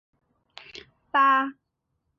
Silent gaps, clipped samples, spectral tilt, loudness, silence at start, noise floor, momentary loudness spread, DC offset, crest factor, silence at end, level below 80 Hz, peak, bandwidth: none; under 0.1%; -3.5 dB/octave; -22 LUFS; 0.75 s; -78 dBFS; 24 LU; under 0.1%; 18 dB; 0.65 s; -72 dBFS; -10 dBFS; 7.2 kHz